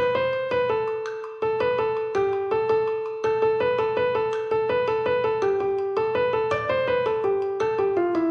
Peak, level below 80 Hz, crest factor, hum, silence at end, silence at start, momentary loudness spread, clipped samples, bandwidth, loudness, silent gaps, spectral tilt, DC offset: -12 dBFS; -58 dBFS; 12 dB; none; 0 s; 0 s; 3 LU; under 0.1%; 6.8 kHz; -24 LUFS; none; -6.5 dB/octave; under 0.1%